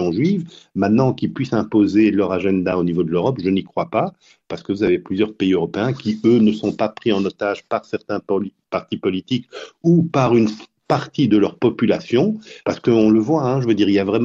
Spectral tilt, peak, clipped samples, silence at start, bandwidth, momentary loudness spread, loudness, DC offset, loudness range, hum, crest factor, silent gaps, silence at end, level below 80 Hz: -7.5 dB/octave; -4 dBFS; under 0.1%; 0 s; 7.4 kHz; 10 LU; -19 LUFS; under 0.1%; 3 LU; none; 14 dB; none; 0 s; -54 dBFS